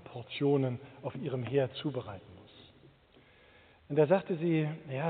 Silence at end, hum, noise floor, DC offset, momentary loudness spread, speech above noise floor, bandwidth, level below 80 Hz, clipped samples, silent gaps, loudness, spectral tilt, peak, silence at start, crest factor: 0 s; none; -62 dBFS; under 0.1%; 14 LU; 30 dB; 4.6 kHz; -70 dBFS; under 0.1%; none; -32 LUFS; -6.5 dB/octave; -14 dBFS; 0.05 s; 20 dB